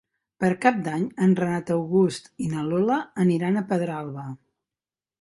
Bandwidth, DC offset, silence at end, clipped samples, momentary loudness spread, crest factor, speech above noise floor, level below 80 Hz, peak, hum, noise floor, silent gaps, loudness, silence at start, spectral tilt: 11.5 kHz; under 0.1%; 0.85 s; under 0.1%; 11 LU; 20 dB; over 67 dB; -64 dBFS; -4 dBFS; none; under -90 dBFS; none; -24 LUFS; 0.4 s; -7.5 dB/octave